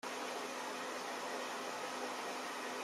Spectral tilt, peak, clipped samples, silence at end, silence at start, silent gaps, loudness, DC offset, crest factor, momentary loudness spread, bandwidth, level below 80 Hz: -1.5 dB/octave; -30 dBFS; under 0.1%; 0 s; 0.05 s; none; -42 LUFS; under 0.1%; 12 dB; 1 LU; 16 kHz; under -90 dBFS